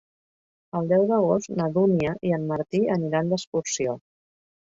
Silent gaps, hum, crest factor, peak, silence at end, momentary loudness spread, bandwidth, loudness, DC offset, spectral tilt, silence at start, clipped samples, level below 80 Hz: 3.47-3.52 s; none; 16 dB; -8 dBFS; 0.7 s; 8 LU; 7.8 kHz; -24 LUFS; under 0.1%; -6 dB/octave; 0.75 s; under 0.1%; -60 dBFS